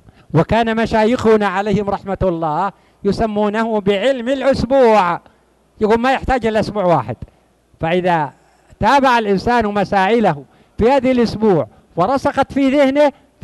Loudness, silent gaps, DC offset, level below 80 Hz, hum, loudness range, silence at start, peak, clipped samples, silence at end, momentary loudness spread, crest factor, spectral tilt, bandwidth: -16 LUFS; none; under 0.1%; -38 dBFS; none; 2 LU; 0.35 s; -2 dBFS; under 0.1%; 0.3 s; 8 LU; 12 dB; -6.5 dB/octave; 12 kHz